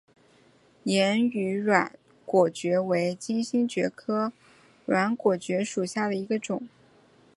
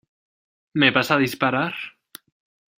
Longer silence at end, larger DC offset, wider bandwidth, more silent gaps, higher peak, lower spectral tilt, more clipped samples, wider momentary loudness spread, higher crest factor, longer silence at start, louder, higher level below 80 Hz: second, 0.7 s vs 0.9 s; neither; second, 11.5 kHz vs 16 kHz; neither; about the same, -4 dBFS vs -2 dBFS; about the same, -5 dB/octave vs -5 dB/octave; neither; second, 10 LU vs 15 LU; about the same, 22 dB vs 22 dB; about the same, 0.85 s vs 0.75 s; second, -27 LUFS vs -20 LUFS; second, -74 dBFS vs -64 dBFS